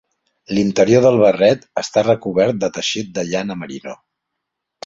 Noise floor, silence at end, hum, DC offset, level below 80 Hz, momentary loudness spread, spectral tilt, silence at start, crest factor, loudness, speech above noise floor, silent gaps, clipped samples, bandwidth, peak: -78 dBFS; 0.9 s; none; under 0.1%; -54 dBFS; 15 LU; -5 dB/octave; 0.5 s; 16 dB; -16 LUFS; 62 dB; none; under 0.1%; 7.8 kHz; -2 dBFS